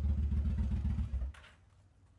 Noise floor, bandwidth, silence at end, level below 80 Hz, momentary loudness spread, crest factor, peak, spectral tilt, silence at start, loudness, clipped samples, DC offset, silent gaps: -64 dBFS; 4.1 kHz; 0.7 s; -38 dBFS; 10 LU; 12 dB; -24 dBFS; -9 dB/octave; 0 s; -37 LUFS; under 0.1%; under 0.1%; none